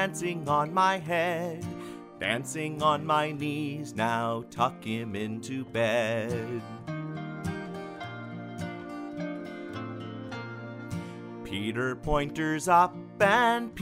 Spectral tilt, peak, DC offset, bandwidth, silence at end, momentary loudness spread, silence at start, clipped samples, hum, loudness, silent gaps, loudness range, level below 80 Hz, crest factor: -5 dB/octave; -10 dBFS; under 0.1%; 16 kHz; 0 s; 15 LU; 0 s; under 0.1%; none; -30 LUFS; none; 10 LU; -52 dBFS; 20 dB